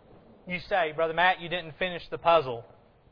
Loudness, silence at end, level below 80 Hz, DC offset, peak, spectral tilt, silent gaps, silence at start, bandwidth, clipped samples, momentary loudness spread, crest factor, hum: -27 LUFS; 0.5 s; -56 dBFS; under 0.1%; -8 dBFS; -6.5 dB/octave; none; 0.45 s; 5.4 kHz; under 0.1%; 12 LU; 20 dB; none